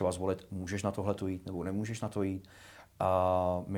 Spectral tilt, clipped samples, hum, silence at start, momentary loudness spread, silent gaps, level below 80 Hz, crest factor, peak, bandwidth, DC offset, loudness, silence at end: -6.5 dB/octave; under 0.1%; none; 0 s; 13 LU; none; -64 dBFS; 18 dB; -16 dBFS; 18 kHz; under 0.1%; -34 LUFS; 0 s